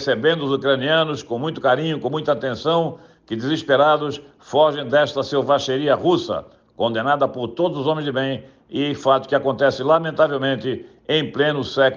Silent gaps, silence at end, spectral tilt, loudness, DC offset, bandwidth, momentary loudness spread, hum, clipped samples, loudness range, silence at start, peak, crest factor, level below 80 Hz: none; 0 s; -6 dB/octave; -20 LUFS; under 0.1%; 7.4 kHz; 9 LU; none; under 0.1%; 2 LU; 0 s; -4 dBFS; 16 dB; -62 dBFS